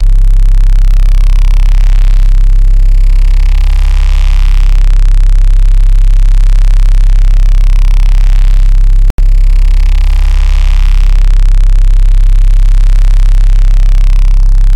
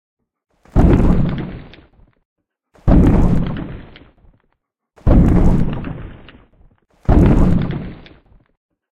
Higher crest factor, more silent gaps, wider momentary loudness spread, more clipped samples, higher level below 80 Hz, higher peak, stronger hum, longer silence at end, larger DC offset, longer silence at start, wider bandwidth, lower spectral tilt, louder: second, 4 dB vs 16 dB; about the same, 9.10-9.18 s vs 2.25-2.36 s; second, 1 LU vs 20 LU; neither; first, -4 dBFS vs -20 dBFS; about the same, 0 dBFS vs 0 dBFS; neither; second, 0 s vs 0.95 s; neither; second, 0 s vs 0.75 s; second, 5.6 kHz vs 7.6 kHz; second, -5.5 dB/octave vs -9.5 dB/octave; first, -11 LUFS vs -16 LUFS